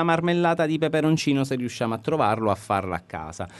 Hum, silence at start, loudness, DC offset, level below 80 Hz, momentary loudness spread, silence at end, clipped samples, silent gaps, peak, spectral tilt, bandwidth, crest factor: none; 0 s; -24 LUFS; under 0.1%; -56 dBFS; 9 LU; 0 s; under 0.1%; none; -6 dBFS; -6 dB/octave; 12 kHz; 16 dB